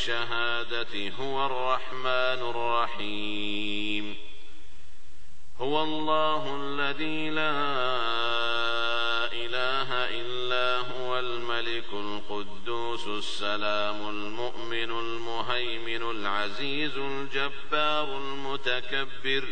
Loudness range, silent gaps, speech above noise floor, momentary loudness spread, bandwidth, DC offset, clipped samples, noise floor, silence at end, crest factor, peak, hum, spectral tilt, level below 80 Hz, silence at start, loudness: 4 LU; none; 25 dB; 7 LU; 9 kHz; 5%; under 0.1%; -55 dBFS; 0 s; 18 dB; -10 dBFS; none; -4 dB/octave; -62 dBFS; 0 s; -29 LUFS